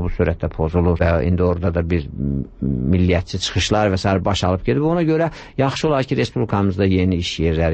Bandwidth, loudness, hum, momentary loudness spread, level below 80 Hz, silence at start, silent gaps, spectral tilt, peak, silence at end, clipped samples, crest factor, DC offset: 8.6 kHz; -19 LUFS; none; 5 LU; -32 dBFS; 0 s; none; -6.5 dB/octave; -4 dBFS; 0 s; under 0.1%; 14 dB; under 0.1%